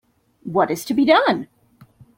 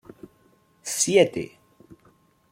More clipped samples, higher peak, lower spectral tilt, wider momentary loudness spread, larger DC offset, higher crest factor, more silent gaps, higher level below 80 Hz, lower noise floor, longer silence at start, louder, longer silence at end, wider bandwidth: neither; first, -2 dBFS vs -6 dBFS; first, -5 dB/octave vs -3 dB/octave; about the same, 19 LU vs 19 LU; neither; about the same, 20 dB vs 22 dB; neither; about the same, -62 dBFS vs -66 dBFS; second, -50 dBFS vs -61 dBFS; second, 0.45 s vs 0.85 s; first, -18 LUFS vs -22 LUFS; second, 0.7 s vs 1.05 s; about the same, 16.5 kHz vs 16.5 kHz